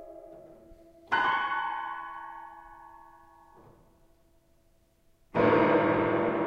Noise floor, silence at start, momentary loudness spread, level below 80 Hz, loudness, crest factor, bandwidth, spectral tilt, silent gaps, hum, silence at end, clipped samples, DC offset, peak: -65 dBFS; 0 s; 26 LU; -62 dBFS; -27 LUFS; 20 dB; 7 kHz; -7.5 dB/octave; none; none; 0 s; under 0.1%; under 0.1%; -12 dBFS